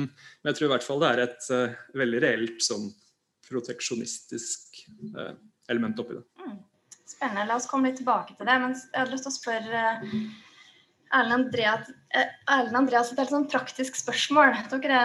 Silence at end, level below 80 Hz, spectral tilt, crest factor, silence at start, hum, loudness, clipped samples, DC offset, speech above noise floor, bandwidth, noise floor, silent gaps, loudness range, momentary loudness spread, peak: 0 s; -78 dBFS; -3 dB/octave; 22 dB; 0 s; none; -26 LUFS; under 0.1%; under 0.1%; 31 dB; 12.5 kHz; -58 dBFS; none; 9 LU; 15 LU; -6 dBFS